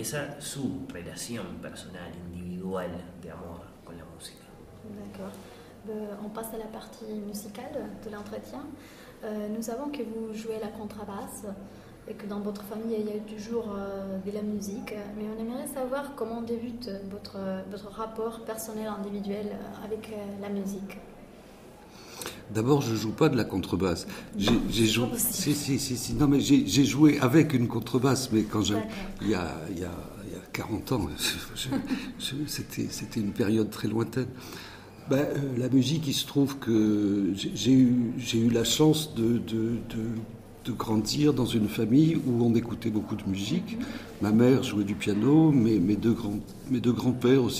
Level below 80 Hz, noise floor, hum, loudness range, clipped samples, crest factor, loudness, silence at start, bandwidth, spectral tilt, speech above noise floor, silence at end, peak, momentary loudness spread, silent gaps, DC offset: -52 dBFS; -49 dBFS; none; 14 LU; under 0.1%; 20 dB; -28 LUFS; 0 s; 15.5 kHz; -5.5 dB/octave; 22 dB; 0 s; -8 dBFS; 19 LU; none; under 0.1%